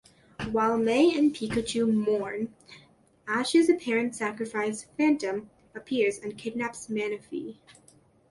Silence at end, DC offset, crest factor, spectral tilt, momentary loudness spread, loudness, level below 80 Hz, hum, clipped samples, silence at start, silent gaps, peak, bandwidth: 0.75 s; under 0.1%; 16 dB; -4.5 dB/octave; 15 LU; -27 LUFS; -60 dBFS; none; under 0.1%; 0.4 s; none; -12 dBFS; 11.5 kHz